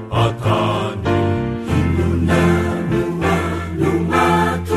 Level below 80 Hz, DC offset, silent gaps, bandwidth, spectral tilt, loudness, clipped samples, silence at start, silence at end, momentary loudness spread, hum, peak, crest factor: -34 dBFS; under 0.1%; none; 14 kHz; -7 dB/octave; -18 LUFS; under 0.1%; 0 s; 0 s; 5 LU; none; -2 dBFS; 14 dB